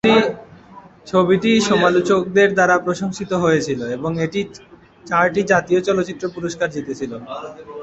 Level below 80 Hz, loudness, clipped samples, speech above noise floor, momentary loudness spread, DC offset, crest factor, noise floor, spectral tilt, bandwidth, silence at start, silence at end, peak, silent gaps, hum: -54 dBFS; -18 LUFS; under 0.1%; 25 dB; 13 LU; under 0.1%; 16 dB; -43 dBFS; -5 dB/octave; 8.2 kHz; 0.05 s; 0 s; -2 dBFS; none; none